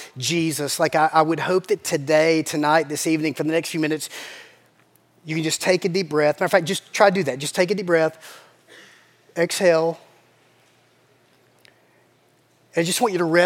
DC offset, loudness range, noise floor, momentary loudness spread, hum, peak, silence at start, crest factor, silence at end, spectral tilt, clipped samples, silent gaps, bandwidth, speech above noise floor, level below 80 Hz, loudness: under 0.1%; 6 LU; -60 dBFS; 10 LU; none; 0 dBFS; 0 s; 22 dB; 0 s; -4 dB/octave; under 0.1%; none; 17 kHz; 39 dB; -76 dBFS; -21 LUFS